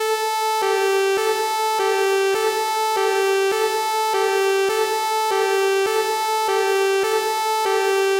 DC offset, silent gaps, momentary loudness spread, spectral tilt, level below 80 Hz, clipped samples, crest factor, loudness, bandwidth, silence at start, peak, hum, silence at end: under 0.1%; none; 2 LU; -0.5 dB/octave; -70 dBFS; under 0.1%; 10 dB; -20 LUFS; 16 kHz; 0 s; -8 dBFS; none; 0 s